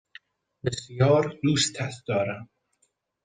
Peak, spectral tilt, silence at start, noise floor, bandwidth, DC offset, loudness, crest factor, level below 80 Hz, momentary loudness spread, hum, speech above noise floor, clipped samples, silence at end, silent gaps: -8 dBFS; -5 dB/octave; 0.65 s; -72 dBFS; 9.8 kHz; under 0.1%; -25 LUFS; 18 dB; -62 dBFS; 12 LU; none; 47 dB; under 0.1%; 0.8 s; none